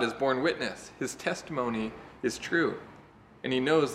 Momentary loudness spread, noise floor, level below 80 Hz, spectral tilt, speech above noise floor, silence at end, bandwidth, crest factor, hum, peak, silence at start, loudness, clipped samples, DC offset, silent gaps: 11 LU; -54 dBFS; -62 dBFS; -4.5 dB/octave; 24 dB; 0 s; 15 kHz; 20 dB; none; -12 dBFS; 0 s; -31 LUFS; under 0.1%; under 0.1%; none